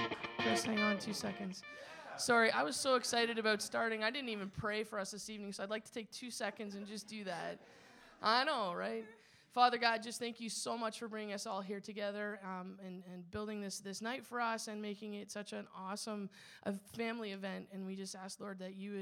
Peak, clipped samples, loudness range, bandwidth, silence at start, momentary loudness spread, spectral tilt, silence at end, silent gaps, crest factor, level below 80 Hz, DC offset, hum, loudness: -16 dBFS; under 0.1%; 9 LU; 17 kHz; 0 s; 14 LU; -3 dB/octave; 0 s; none; 24 dB; -76 dBFS; under 0.1%; none; -39 LUFS